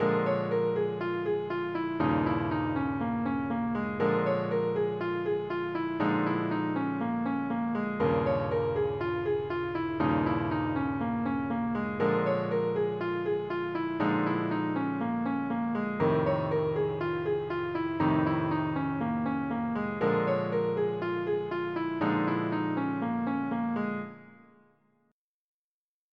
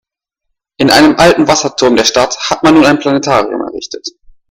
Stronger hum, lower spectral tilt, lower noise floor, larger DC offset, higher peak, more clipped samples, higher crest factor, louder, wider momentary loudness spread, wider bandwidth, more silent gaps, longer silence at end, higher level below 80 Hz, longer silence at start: neither; first, -9.5 dB/octave vs -3.5 dB/octave; first, under -90 dBFS vs -71 dBFS; neither; second, -14 dBFS vs 0 dBFS; second, under 0.1% vs 0.8%; about the same, 14 dB vs 10 dB; second, -30 LUFS vs -9 LUFS; second, 4 LU vs 15 LU; second, 5.8 kHz vs 16.5 kHz; neither; first, 1.75 s vs 0.4 s; second, -60 dBFS vs -38 dBFS; second, 0 s vs 0.8 s